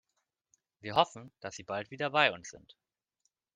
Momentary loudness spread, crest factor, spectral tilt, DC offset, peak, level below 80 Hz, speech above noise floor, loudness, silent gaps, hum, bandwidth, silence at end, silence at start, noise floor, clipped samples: 18 LU; 26 dB; -3.5 dB/octave; under 0.1%; -8 dBFS; -74 dBFS; 50 dB; -31 LUFS; none; none; 10 kHz; 0.95 s; 0.85 s; -83 dBFS; under 0.1%